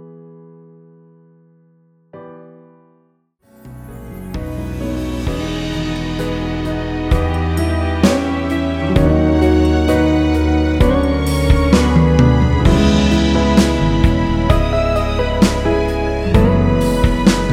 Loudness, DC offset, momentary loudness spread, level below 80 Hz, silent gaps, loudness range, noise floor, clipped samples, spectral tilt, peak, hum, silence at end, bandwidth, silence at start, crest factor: -15 LUFS; under 0.1%; 9 LU; -22 dBFS; none; 12 LU; -58 dBFS; under 0.1%; -6.5 dB/octave; 0 dBFS; none; 0 s; 15.5 kHz; 0 s; 14 dB